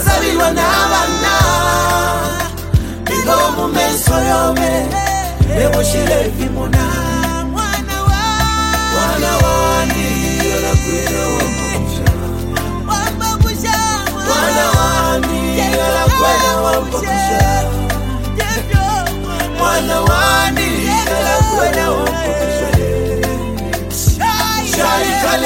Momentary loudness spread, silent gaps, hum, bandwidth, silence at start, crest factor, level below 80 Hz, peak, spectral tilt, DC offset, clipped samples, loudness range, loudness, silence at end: 6 LU; none; none; 16.5 kHz; 0 s; 14 dB; -22 dBFS; 0 dBFS; -4 dB/octave; under 0.1%; under 0.1%; 2 LU; -14 LUFS; 0 s